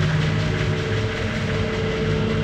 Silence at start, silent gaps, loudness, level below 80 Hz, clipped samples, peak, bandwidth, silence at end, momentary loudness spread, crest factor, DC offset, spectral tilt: 0 s; none; -23 LUFS; -34 dBFS; under 0.1%; -10 dBFS; 9.2 kHz; 0 s; 2 LU; 12 dB; under 0.1%; -6.5 dB/octave